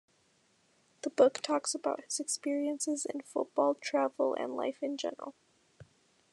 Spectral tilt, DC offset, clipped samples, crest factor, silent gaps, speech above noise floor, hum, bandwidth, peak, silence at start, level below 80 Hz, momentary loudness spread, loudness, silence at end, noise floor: -2 dB/octave; under 0.1%; under 0.1%; 22 dB; none; 38 dB; none; 12.5 kHz; -12 dBFS; 1.05 s; -86 dBFS; 11 LU; -33 LUFS; 0.5 s; -71 dBFS